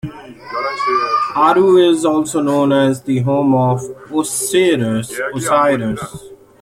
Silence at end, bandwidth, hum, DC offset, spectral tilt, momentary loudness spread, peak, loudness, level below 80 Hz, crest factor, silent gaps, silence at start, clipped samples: 0.25 s; 16 kHz; none; under 0.1%; -5 dB/octave; 11 LU; -2 dBFS; -15 LUFS; -52 dBFS; 14 dB; none; 0.05 s; under 0.1%